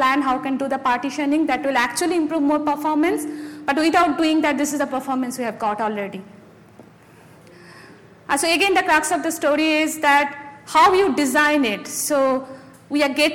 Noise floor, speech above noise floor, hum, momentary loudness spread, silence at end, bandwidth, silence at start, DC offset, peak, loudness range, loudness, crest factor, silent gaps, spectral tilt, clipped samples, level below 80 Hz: -47 dBFS; 28 dB; none; 10 LU; 0 s; 17.5 kHz; 0 s; under 0.1%; -4 dBFS; 8 LU; -19 LUFS; 16 dB; none; -2.5 dB/octave; under 0.1%; -56 dBFS